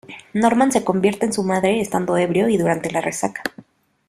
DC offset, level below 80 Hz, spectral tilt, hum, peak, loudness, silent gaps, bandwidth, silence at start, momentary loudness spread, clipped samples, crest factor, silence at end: under 0.1%; -56 dBFS; -5.5 dB/octave; none; -2 dBFS; -19 LUFS; none; 15 kHz; 0.1 s; 8 LU; under 0.1%; 18 dB; 0.45 s